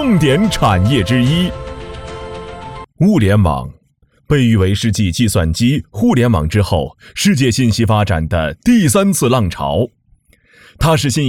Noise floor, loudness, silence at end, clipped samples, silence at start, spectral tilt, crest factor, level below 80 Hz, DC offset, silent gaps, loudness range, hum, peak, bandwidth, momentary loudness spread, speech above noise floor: -56 dBFS; -14 LUFS; 0 s; under 0.1%; 0 s; -5.5 dB/octave; 14 dB; -32 dBFS; under 0.1%; none; 2 LU; none; 0 dBFS; 17 kHz; 16 LU; 43 dB